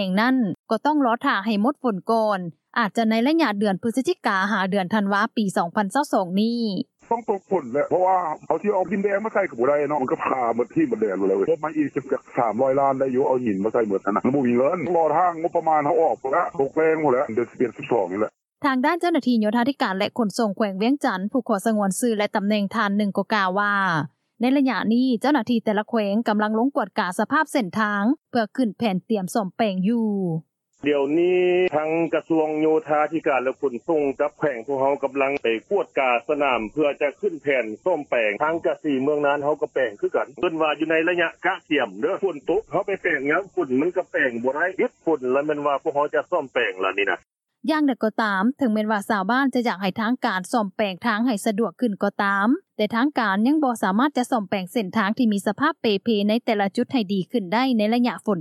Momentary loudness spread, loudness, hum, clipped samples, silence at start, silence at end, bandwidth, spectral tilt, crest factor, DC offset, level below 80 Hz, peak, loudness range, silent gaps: 5 LU; -22 LUFS; none; under 0.1%; 0 s; 0 s; 13.5 kHz; -6 dB/octave; 16 dB; under 0.1%; -68 dBFS; -6 dBFS; 2 LU; 0.59-0.64 s